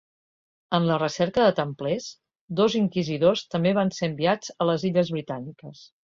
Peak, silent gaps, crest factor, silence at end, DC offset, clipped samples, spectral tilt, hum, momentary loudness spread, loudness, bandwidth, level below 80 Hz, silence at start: -6 dBFS; 2.41-2.48 s; 18 dB; 0.2 s; under 0.1%; under 0.1%; -6 dB/octave; none; 13 LU; -24 LUFS; 7.6 kHz; -62 dBFS; 0.7 s